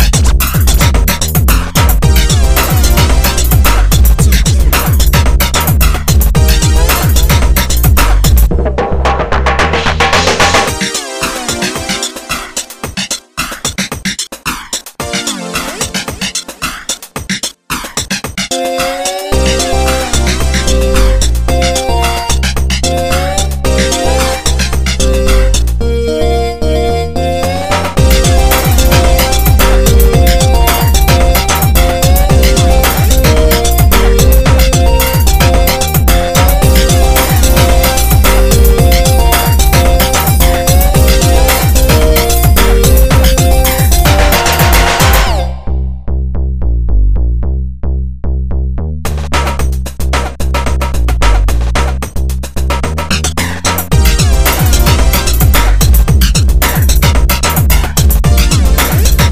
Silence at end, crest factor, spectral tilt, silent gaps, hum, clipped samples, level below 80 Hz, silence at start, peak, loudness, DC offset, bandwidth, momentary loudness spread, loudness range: 0 s; 8 dB; -4 dB/octave; none; none; 0.7%; -10 dBFS; 0 s; 0 dBFS; -10 LUFS; 2%; 16 kHz; 8 LU; 7 LU